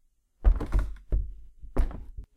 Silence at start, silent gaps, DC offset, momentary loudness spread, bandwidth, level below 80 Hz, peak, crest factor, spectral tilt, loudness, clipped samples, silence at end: 0.4 s; none; under 0.1%; 15 LU; 4.2 kHz; -28 dBFS; -10 dBFS; 18 dB; -8.5 dB/octave; -32 LUFS; under 0.1%; 0.1 s